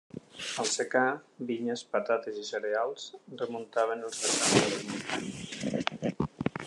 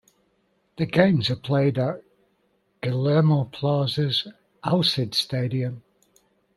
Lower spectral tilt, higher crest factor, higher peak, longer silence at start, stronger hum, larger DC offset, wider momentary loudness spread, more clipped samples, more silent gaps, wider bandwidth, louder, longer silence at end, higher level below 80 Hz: second, -3 dB/octave vs -6.5 dB/octave; about the same, 24 dB vs 20 dB; second, -8 dBFS vs -4 dBFS; second, 0.15 s vs 0.8 s; neither; neither; about the same, 12 LU vs 12 LU; neither; neither; about the same, 12.5 kHz vs 12.5 kHz; second, -31 LUFS vs -23 LUFS; second, 0 s vs 0.8 s; about the same, -62 dBFS vs -60 dBFS